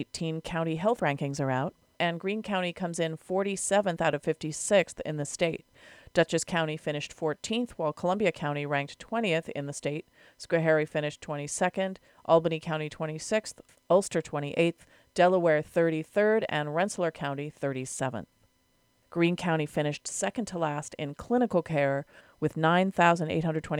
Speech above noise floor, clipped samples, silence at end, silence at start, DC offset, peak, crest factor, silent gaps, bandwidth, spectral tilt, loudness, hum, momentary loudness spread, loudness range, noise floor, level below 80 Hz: 40 dB; under 0.1%; 0 s; 0 s; under 0.1%; -8 dBFS; 20 dB; none; 15 kHz; -5 dB/octave; -29 LUFS; none; 9 LU; 4 LU; -69 dBFS; -62 dBFS